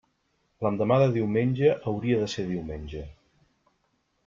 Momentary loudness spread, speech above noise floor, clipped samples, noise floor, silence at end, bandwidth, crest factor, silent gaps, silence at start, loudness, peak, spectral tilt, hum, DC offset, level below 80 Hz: 15 LU; 47 dB; under 0.1%; -72 dBFS; 1.15 s; 7.6 kHz; 18 dB; none; 0.6 s; -26 LUFS; -8 dBFS; -7.5 dB/octave; none; under 0.1%; -52 dBFS